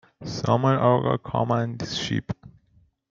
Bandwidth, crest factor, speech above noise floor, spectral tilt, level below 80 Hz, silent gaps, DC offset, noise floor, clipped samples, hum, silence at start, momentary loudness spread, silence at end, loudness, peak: 7.6 kHz; 20 dB; 39 dB; -6.5 dB/octave; -56 dBFS; none; under 0.1%; -62 dBFS; under 0.1%; none; 0.2 s; 14 LU; 0.6 s; -24 LUFS; -4 dBFS